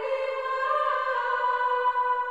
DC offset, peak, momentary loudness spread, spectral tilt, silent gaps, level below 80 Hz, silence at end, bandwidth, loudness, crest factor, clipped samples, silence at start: 0.1%; -14 dBFS; 4 LU; -1 dB/octave; none; -68 dBFS; 0 s; 8.2 kHz; -26 LUFS; 12 dB; under 0.1%; 0 s